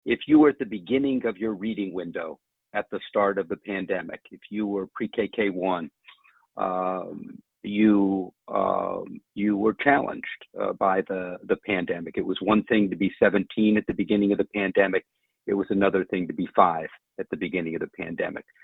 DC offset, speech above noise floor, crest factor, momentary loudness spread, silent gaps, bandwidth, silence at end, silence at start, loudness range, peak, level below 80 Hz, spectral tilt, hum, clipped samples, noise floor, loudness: under 0.1%; 31 dB; 22 dB; 13 LU; none; 4 kHz; 0.2 s; 0.05 s; 6 LU; -2 dBFS; -60 dBFS; -9 dB/octave; none; under 0.1%; -56 dBFS; -25 LUFS